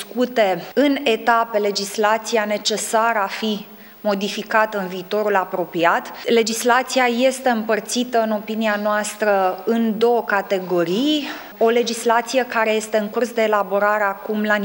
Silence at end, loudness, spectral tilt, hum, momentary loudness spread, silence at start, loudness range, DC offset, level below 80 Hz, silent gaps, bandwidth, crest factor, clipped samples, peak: 0 s; -19 LUFS; -3.5 dB/octave; none; 5 LU; 0 s; 2 LU; under 0.1%; -66 dBFS; none; 17 kHz; 18 dB; under 0.1%; -2 dBFS